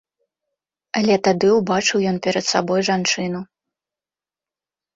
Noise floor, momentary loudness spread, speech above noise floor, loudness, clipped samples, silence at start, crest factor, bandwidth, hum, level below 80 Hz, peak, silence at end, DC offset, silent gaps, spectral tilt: under -90 dBFS; 8 LU; over 72 dB; -19 LUFS; under 0.1%; 0.95 s; 18 dB; 8 kHz; none; -60 dBFS; -4 dBFS; 1.5 s; under 0.1%; none; -4 dB/octave